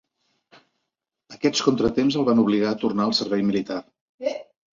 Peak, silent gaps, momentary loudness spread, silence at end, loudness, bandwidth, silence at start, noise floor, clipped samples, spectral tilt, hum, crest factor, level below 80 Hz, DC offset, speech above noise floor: -4 dBFS; 4.01-4.18 s; 11 LU; 0.35 s; -22 LUFS; 7.6 kHz; 1.3 s; -82 dBFS; under 0.1%; -5 dB/octave; none; 20 dB; -56 dBFS; under 0.1%; 60 dB